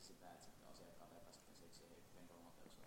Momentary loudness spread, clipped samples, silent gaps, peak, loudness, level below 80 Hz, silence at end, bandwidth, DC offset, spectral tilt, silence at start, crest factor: 2 LU; under 0.1%; none; -46 dBFS; -64 LUFS; -76 dBFS; 0 s; 16 kHz; under 0.1%; -3.5 dB/octave; 0 s; 16 dB